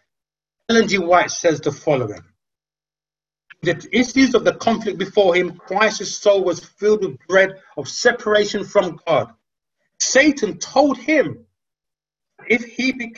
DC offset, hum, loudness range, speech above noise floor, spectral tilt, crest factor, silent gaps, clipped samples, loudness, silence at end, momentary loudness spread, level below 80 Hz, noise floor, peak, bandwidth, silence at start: under 0.1%; none; 3 LU; over 72 dB; -3.5 dB/octave; 18 dB; none; under 0.1%; -18 LUFS; 0.05 s; 8 LU; -56 dBFS; under -90 dBFS; 0 dBFS; 8 kHz; 0.7 s